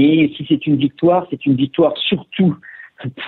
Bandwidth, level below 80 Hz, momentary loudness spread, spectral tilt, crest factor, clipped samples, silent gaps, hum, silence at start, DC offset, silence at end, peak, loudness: 4.2 kHz; -56 dBFS; 16 LU; -10 dB/octave; 12 dB; under 0.1%; none; none; 0 s; under 0.1%; 0 s; -4 dBFS; -16 LUFS